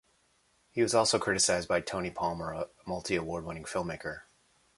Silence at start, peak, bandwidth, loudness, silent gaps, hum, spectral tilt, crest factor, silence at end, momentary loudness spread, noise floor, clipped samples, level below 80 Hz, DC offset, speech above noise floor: 0.75 s; -12 dBFS; 11.5 kHz; -31 LUFS; none; none; -3 dB/octave; 20 dB; 0.55 s; 13 LU; -70 dBFS; under 0.1%; -58 dBFS; under 0.1%; 39 dB